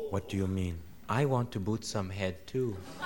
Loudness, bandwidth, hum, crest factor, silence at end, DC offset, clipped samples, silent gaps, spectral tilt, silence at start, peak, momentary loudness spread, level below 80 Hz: -34 LUFS; 20 kHz; none; 20 dB; 0 s; 0.3%; under 0.1%; none; -6.5 dB/octave; 0 s; -14 dBFS; 7 LU; -56 dBFS